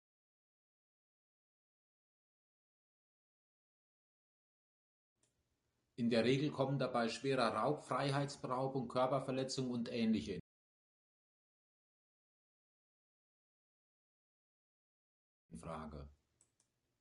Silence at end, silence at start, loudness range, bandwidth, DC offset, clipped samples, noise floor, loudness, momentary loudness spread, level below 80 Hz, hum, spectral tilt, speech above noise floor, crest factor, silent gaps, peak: 0.9 s; 6 s; 19 LU; 11 kHz; under 0.1%; under 0.1%; -85 dBFS; -38 LUFS; 14 LU; -72 dBFS; none; -6 dB/octave; 48 dB; 24 dB; 10.40-15.49 s; -20 dBFS